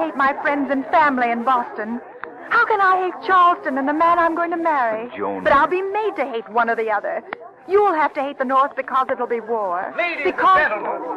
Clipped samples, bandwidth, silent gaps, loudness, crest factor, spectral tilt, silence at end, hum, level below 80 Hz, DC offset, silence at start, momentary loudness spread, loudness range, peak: under 0.1%; 9.8 kHz; none; -19 LUFS; 14 dB; -5.5 dB/octave; 0 s; none; -56 dBFS; under 0.1%; 0 s; 11 LU; 3 LU; -6 dBFS